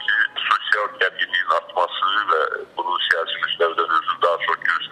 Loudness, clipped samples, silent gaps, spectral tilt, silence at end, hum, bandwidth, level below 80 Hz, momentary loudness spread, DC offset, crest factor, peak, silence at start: -20 LUFS; under 0.1%; none; -1.5 dB/octave; 0 s; none; 12.5 kHz; -70 dBFS; 4 LU; under 0.1%; 18 dB; -4 dBFS; 0 s